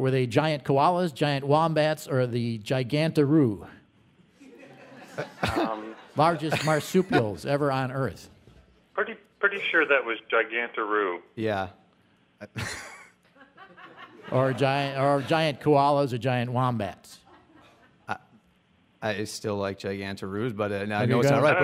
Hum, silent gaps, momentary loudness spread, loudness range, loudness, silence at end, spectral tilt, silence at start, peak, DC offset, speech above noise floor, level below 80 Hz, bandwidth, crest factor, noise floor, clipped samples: none; none; 15 LU; 8 LU; -26 LUFS; 0 s; -6 dB/octave; 0 s; -8 dBFS; under 0.1%; 38 dB; -60 dBFS; 16 kHz; 20 dB; -64 dBFS; under 0.1%